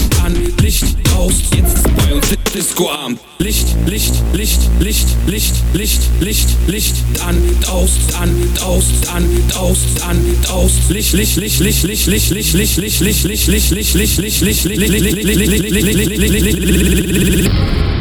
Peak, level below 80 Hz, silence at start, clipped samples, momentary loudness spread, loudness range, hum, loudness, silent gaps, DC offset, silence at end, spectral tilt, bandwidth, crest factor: 0 dBFS; -16 dBFS; 0 s; under 0.1%; 3 LU; 2 LU; none; -13 LUFS; none; under 0.1%; 0 s; -4 dB/octave; over 20 kHz; 12 dB